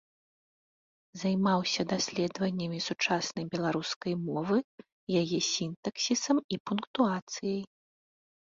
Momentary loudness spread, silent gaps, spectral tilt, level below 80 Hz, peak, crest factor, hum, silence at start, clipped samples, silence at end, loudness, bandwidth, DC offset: 8 LU; 3.96-4.01 s, 4.64-4.78 s, 4.92-5.07 s, 5.76-5.83 s, 6.44-6.49 s, 6.60-6.65 s, 6.87-6.94 s, 7.22-7.27 s; -4.5 dB/octave; -70 dBFS; -12 dBFS; 20 dB; none; 1.15 s; under 0.1%; 0.8 s; -31 LUFS; 7.8 kHz; under 0.1%